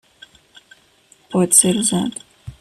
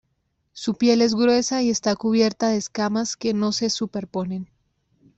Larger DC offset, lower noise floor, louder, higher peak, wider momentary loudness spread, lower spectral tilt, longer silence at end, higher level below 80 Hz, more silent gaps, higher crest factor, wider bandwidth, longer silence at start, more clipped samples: neither; second, -54 dBFS vs -72 dBFS; first, -15 LUFS vs -22 LUFS; first, 0 dBFS vs -6 dBFS; first, 15 LU vs 11 LU; about the same, -3.5 dB/octave vs -4 dB/octave; second, 0.1 s vs 0.75 s; first, -54 dBFS vs -62 dBFS; neither; about the same, 20 dB vs 16 dB; first, 14.5 kHz vs 8.2 kHz; first, 1.3 s vs 0.55 s; neither